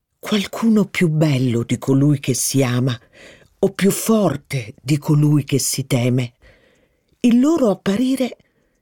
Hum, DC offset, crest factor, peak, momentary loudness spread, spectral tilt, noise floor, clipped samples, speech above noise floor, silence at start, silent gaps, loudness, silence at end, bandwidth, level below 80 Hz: none; under 0.1%; 14 dB; -4 dBFS; 7 LU; -5.5 dB/octave; -60 dBFS; under 0.1%; 43 dB; 0.25 s; none; -18 LUFS; 0.5 s; 19 kHz; -54 dBFS